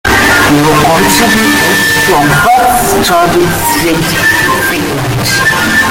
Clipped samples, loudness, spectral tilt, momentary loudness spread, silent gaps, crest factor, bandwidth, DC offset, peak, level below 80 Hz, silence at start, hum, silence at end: under 0.1%; -7 LUFS; -3.5 dB/octave; 4 LU; none; 8 dB; 17.5 kHz; under 0.1%; 0 dBFS; -28 dBFS; 0.05 s; none; 0 s